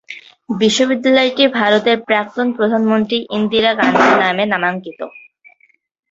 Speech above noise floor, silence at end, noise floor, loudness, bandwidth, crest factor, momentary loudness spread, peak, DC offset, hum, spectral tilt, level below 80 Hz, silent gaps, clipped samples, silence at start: 35 dB; 0.9 s; -50 dBFS; -14 LUFS; 8 kHz; 14 dB; 14 LU; 0 dBFS; under 0.1%; none; -4 dB/octave; -58 dBFS; none; under 0.1%; 0.1 s